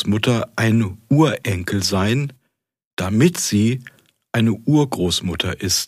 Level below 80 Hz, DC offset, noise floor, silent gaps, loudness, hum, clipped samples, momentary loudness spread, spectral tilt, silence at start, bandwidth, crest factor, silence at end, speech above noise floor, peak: -48 dBFS; under 0.1%; -72 dBFS; 2.85-2.97 s; -19 LUFS; none; under 0.1%; 7 LU; -5 dB/octave; 0 s; 15.5 kHz; 16 dB; 0 s; 54 dB; -2 dBFS